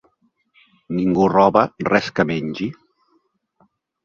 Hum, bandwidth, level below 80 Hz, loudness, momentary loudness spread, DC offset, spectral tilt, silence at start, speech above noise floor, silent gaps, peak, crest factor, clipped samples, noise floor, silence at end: none; 7.2 kHz; -54 dBFS; -18 LUFS; 13 LU; under 0.1%; -7 dB/octave; 0.9 s; 47 dB; none; 0 dBFS; 20 dB; under 0.1%; -65 dBFS; 1.3 s